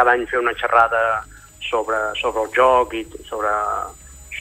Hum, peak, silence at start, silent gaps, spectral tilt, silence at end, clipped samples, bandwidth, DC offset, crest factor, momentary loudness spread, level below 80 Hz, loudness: none; -2 dBFS; 0 s; none; -3.5 dB/octave; 0 s; under 0.1%; 15 kHz; under 0.1%; 18 dB; 15 LU; -46 dBFS; -19 LUFS